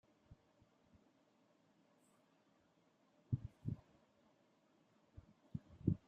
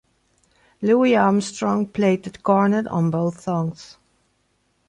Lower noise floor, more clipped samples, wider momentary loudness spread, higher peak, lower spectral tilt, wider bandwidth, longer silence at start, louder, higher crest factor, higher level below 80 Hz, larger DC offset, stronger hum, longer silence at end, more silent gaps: first, -76 dBFS vs -67 dBFS; neither; first, 26 LU vs 9 LU; second, -20 dBFS vs -4 dBFS; first, -10 dB/octave vs -7 dB/octave; second, 8.4 kHz vs 10.5 kHz; second, 0.3 s vs 0.8 s; second, -47 LUFS vs -20 LUFS; first, 30 dB vs 18 dB; second, -68 dBFS vs -60 dBFS; neither; neither; second, 0.1 s vs 1 s; neither